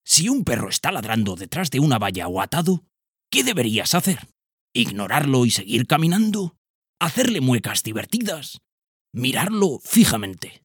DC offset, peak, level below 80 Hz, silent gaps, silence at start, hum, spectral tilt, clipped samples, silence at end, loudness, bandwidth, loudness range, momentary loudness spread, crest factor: under 0.1%; 0 dBFS; -54 dBFS; 4.53-4.68 s, 6.58-6.82 s, 6.89-6.94 s, 8.72-8.82 s, 8.88-9.05 s; 0.05 s; none; -4 dB/octave; under 0.1%; 0.15 s; -21 LUFS; 19 kHz; 2 LU; 9 LU; 20 dB